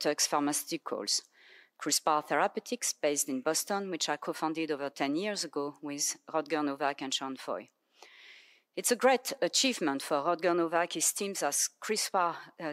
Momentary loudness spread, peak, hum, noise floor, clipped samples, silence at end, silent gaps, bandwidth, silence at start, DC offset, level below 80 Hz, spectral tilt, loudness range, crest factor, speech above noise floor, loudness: 8 LU; -12 dBFS; none; -58 dBFS; under 0.1%; 0 s; none; 16 kHz; 0 s; under 0.1%; under -90 dBFS; -1.5 dB/octave; 5 LU; 20 dB; 26 dB; -31 LUFS